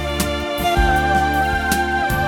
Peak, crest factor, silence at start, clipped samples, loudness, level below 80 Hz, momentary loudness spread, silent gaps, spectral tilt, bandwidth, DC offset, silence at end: -2 dBFS; 16 dB; 0 s; under 0.1%; -18 LUFS; -26 dBFS; 5 LU; none; -4.5 dB/octave; 19 kHz; under 0.1%; 0 s